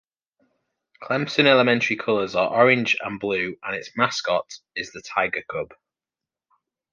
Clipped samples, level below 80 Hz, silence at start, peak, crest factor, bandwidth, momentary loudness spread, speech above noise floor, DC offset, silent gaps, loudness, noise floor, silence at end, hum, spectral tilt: under 0.1%; -64 dBFS; 1 s; -2 dBFS; 22 dB; 7.4 kHz; 15 LU; 67 dB; under 0.1%; none; -22 LUFS; -90 dBFS; 1.2 s; none; -4.5 dB/octave